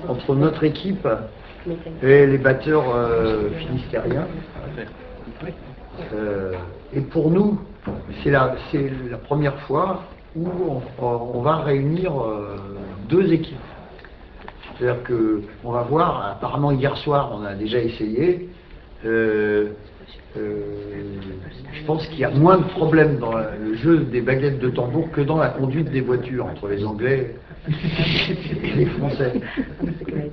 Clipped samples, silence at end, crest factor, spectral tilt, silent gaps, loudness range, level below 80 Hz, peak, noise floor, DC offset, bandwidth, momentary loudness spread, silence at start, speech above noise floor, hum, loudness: under 0.1%; 0 s; 20 dB; -9.5 dB/octave; none; 6 LU; -42 dBFS; 0 dBFS; -42 dBFS; under 0.1%; 6 kHz; 16 LU; 0 s; 21 dB; none; -21 LUFS